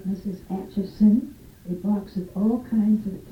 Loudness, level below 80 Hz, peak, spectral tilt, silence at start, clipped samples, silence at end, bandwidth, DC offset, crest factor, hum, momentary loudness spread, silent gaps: -24 LUFS; -50 dBFS; -8 dBFS; -9.5 dB/octave; 0 s; under 0.1%; 0 s; 5.8 kHz; under 0.1%; 16 dB; none; 13 LU; none